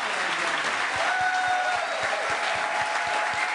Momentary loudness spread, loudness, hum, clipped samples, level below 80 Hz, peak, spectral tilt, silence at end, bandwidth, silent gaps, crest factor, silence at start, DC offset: 2 LU; -25 LUFS; none; under 0.1%; -66 dBFS; -12 dBFS; -1 dB/octave; 0 s; 11 kHz; none; 14 dB; 0 s; under 0.1%